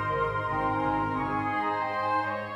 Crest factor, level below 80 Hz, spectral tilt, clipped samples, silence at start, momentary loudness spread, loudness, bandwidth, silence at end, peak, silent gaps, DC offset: 12 dB; -50 dBFS; -7.5 dB/octave; under 0.1%; 0 s; 1 LU; -28 LUFS; 12 kHz; 0 s; -16 dBFS; none; under 0.1%